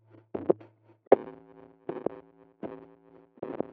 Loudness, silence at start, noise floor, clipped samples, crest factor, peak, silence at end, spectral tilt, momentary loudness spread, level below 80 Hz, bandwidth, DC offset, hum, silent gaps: -30 LUFS; 0.35 s; -57 dBFS; under 0.1%; 30 dB; -4 dBFS; 0.05 s; -7.5 dB/octave; 22 LU; -74 dBFS; 4.1 kHz; under 0.1%; none; 1.07-1.11 s